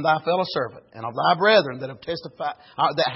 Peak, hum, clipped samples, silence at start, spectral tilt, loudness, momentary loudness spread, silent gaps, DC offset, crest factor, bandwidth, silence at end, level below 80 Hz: -6 dBFS; none; under 0.1%; 0 s; -8 dB/octave; -23 LUFS; 15 LU; none; under 0.1%; 18 dB; 5.8 kHz; 0 s; -64 dBFS